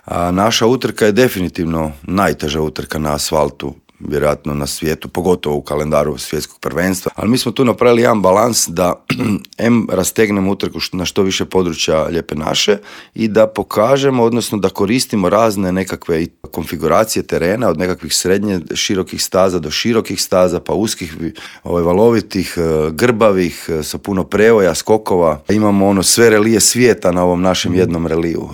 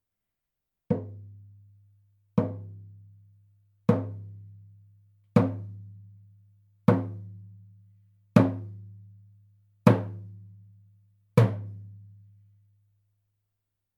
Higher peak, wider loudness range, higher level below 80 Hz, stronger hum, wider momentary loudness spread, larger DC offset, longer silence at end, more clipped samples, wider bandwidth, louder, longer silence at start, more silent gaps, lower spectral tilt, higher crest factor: about the same, 0 dBFS vs -2 dBFS; about the same, 6 LU vs 5 LU; first, -42 dBFS vs -70 dBFS; neither; second, 9 LU vs 25 LU; neither; second, 0 s vs 2 s; neither; first, 20 kHz vs 12.5 kHz; first, -14 LUFS vs -27 LUFS; second, 0.05 s vs 0.9 s; neither; second, -4.5 dB/octave vs -9 dB/octave; second, 14 dB vs 28 dB